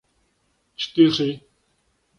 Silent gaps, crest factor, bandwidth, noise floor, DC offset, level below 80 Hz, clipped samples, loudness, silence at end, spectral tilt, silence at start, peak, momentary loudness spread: none; 20 dB; 7 kHz; -68 dBFS; under 0.1%; -64 dBFS; under 0.1%; -20 LUFS; 0.8 s; -6 dB/octave; 0.8 s; -4 dBFS; 21 LU